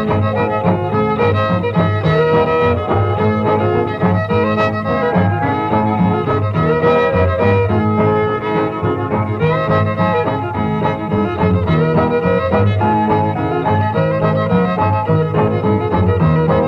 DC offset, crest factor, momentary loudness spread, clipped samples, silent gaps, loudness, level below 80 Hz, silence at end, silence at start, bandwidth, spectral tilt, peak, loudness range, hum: under 0.1%; 14 dB; 4 LU; under 0.1%; none; -15 LUFS; -38 dBFS; 0 s; 0 s; 6 kHz; -9.5 dB/octave; 0 dBFS; 1 LU; none